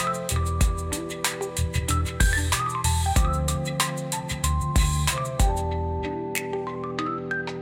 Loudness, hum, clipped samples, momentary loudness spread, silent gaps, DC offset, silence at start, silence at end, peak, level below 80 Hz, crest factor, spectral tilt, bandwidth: -26 LUFS; none; under 0.1%; 7 LU; none; under 0.1%; 0 s; 0 s; -8 dBFS; -30 dBFS; 18 dB; -4 dB/octave; 17 kHz